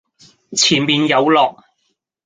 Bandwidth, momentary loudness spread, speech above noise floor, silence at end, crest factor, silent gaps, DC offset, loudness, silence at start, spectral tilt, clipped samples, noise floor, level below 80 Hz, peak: 9.6 kHz; 6 LU; 54 dB; 0.75 s; 16 dB; none; under 0.1%; -14 LUFS; 0.5 s; -3 dB/octave; under 0.1%; -69 dBFS; -60 dBFS; -2 dBFS